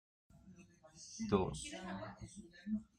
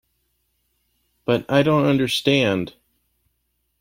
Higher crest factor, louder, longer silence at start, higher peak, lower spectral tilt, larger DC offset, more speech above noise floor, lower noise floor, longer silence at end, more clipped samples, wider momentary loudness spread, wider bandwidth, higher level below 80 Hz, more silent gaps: about the same, 24 dB vs 20 dB; second, -42 LUFS vs -19 LUFS; second, 0.35 s vs 1.3 s; second, -20 dBFS vs -4 dBFS; about the same, -5.5 dB/octave vs -5.5 dB/octave; neither; second, 20 dB vs 53 dB; second, -62 dBFS vs -72 dBFS; second, 0.15 s vs 1.1 s; neither; first, 25 LU vs 10 LU; second, 11 kHz vs 16.5 kHz; second, -62 dBFS vs -56 dBFS; neither